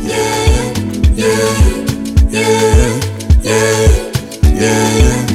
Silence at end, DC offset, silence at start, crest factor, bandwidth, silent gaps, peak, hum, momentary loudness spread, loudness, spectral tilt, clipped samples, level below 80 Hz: 0 s; under 0.1%; 0 s; 10 dB; 15.5 kHz; none; 0 dBFS; none; 5 LU; -12 LUFS; -5 dB/octave; under 0.1%; -14 dBFS